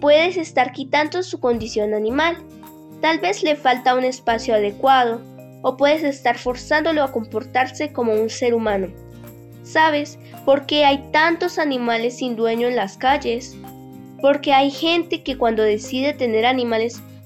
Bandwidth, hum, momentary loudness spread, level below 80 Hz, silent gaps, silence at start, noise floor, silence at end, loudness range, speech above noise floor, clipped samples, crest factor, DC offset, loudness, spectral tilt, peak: 14.5 kHz; none; 9 LU; -50 dBFS; none; 0 s; -39 dBFS; 0 s; 2 LU; 20 dB; under 0.1%; 16 dB; under 0.1%; -19 LUFS; -4 dB/octave; -4 dBFS